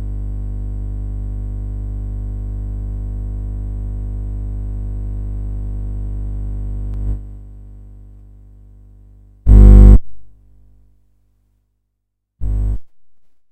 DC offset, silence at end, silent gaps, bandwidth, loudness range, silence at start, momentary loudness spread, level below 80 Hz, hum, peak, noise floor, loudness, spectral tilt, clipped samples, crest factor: under 0.1%; 0.35 s; none; 2.1 kHz; 15 LU; 0 s; 17 LU; -18 dBFS; 50 Hz at -20 dBFS; 0 dBFS; -74 dBFS; -19 LUFS; -10.5 dB/octave; 0.5%; 16 dB